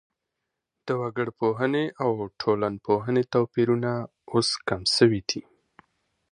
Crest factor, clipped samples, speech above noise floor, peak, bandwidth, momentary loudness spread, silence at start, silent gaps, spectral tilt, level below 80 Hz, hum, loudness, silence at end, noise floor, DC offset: 20 dB; under 0.1%; 58 dB; -6 dBFS; 10.5 kHz; 9 LU; 0.85 s; none; -5 dB/octave; -60 dBFS; none; -25 LUFS; 0.95 s; -83 dBFS; under 0.1%